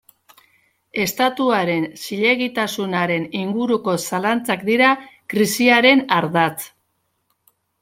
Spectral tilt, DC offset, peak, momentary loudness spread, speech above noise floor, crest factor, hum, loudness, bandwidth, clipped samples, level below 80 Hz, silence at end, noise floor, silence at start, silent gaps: -4 dB/octave; under 0.1%; -2 dBFS; 10 LU; 51 dB; 18 dB; none; -18 LUFS; 16.5 kHz; under 0.1%; -64 dBFS; 1.15 s; -70 dBFS; 0.95 s; none